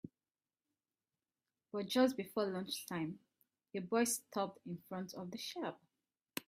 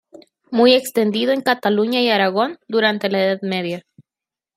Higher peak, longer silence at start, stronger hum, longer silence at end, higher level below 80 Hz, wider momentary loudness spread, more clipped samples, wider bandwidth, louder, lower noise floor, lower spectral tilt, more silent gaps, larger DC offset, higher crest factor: second, -20 dBFS vs -2 dBFS; second, 0.05 s vs 0.5 s; neither; second, 0.05 s vs 0.75 s; second, -84 dBFS vs -70 dBFS; first, 14 LU vs 10 LU; neither; about the same, 16 kHz vs 15.5 kHz; second, -40 LUFS vs -18 LUFS; about the same, under -90 dBFS vs -89 dBFS; about the same, -4 dB/octave vs -4.5 dB/octave; neither; neither; first, 22 dB vs 16 dB